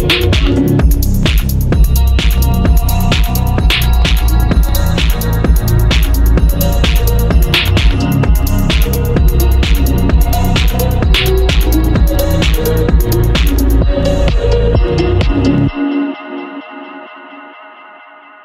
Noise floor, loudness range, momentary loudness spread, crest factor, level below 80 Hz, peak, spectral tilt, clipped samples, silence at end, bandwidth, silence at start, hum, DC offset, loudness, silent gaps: -37 dBFS; 2 LU; 3 LU; 10 dB; -12 dBFS; 0 dBFS; -5.5 dB/octave; under 0.1%; 0.75 s; 16.5 kHz; 0 s; none; under 0.1%; -12 LUFS; none